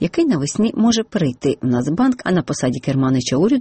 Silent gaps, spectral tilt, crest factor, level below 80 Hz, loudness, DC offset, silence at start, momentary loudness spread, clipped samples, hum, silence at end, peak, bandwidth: none; -5.5 dB/octave; 12 dB; -48 dBFS; -18 LUFS; under 0.1%; 0 s; 4 LU; under 0.1%; none; 0 s; -6 dBFS; 8.8 kHz